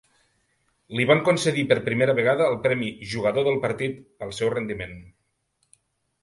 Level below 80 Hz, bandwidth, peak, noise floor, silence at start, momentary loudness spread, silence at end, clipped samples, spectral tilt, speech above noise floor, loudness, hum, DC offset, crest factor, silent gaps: -58 dBFS; 11.5 kHz; -4 dBFS; -72 dBFS; 0.9 s; 13 LU; 1.15 s; under 0.1%; -5.5 dB/octave; 49 dB; -23 LUFS; none; under 0.1%; 22 dB; none